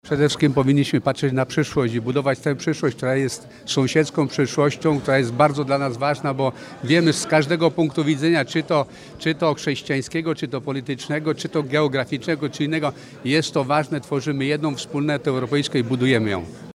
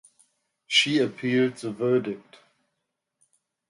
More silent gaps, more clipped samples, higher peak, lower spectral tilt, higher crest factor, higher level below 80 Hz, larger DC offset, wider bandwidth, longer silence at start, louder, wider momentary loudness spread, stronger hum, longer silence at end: neither; neither; first, -2 dBFS vs -6 dBFS; first, -5.5 dB/octave vs -4 dB/octave; about the same, 18 dB vs 22 dB; first, -56 dBFS vs -74 dBFS; neither; first, 13.5 kHz vs 11.5 kHz; second, 0.05 s vs 0.7 s; first, -21 LUFS vs -24 LUFS; second, 7 LU vs 11 LU; neither; second, 0.05 s vs 1.5 s